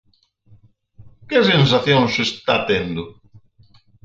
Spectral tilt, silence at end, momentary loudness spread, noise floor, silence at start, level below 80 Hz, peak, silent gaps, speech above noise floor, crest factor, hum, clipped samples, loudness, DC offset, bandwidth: -5.5 dB/octave; 0.95 s; 13 LU; -53 dBFS; 1 s; -50 dBFS; -2 dBFS; none; 36 dB; 18 dB; none; under 0.1%; -17 LUFS; under 0.1%; 7.8 kHz